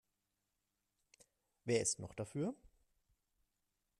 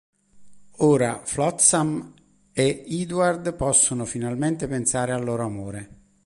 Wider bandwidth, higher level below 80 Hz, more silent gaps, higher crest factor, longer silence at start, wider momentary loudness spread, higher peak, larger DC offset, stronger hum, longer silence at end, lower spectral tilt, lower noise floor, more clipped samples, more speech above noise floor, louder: first, 13.5 kHz vs 11.5 kHz; second, -74 dBFS vs -50 dBFS; neither; about the same, 24 dB vs 20 dB; first, 1.65 s vs 0.35 s; about the same, 14 LU vs 13 LU; second, -22 dBFS vs -4 dBFS; neither; neither; first, 1.35 s vs 0.35 s; about the same, -4 dB/octave vs -4 dB/octave; first, -87 dBFS vs -50 dBFS; neither; first, 48 dB vs 27 dB; second, -40 LUFS vs -22 LUFS